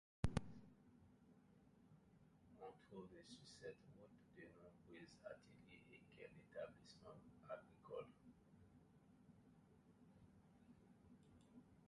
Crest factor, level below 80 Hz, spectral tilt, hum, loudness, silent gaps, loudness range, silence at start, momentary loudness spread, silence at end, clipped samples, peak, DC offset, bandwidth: 32 dB; -68 dBFS; -6.5 dB/octave; none; -58 LUFS; none; 4 LU; 0.25 s; 14 LU; 0 s; under 0.1%; -26 dBFS; under 0.1%; 11 kHz